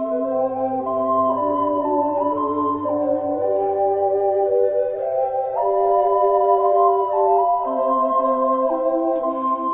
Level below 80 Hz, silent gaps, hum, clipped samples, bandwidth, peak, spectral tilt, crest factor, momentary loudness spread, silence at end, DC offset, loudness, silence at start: -60 dBFS; none; none; under 0.1%; 3.6 kHz; -6 dBFS; -11 dB/octave; 14 dB; 5 LU; 0 s; under 0.1%; -20 LUFS; 0 s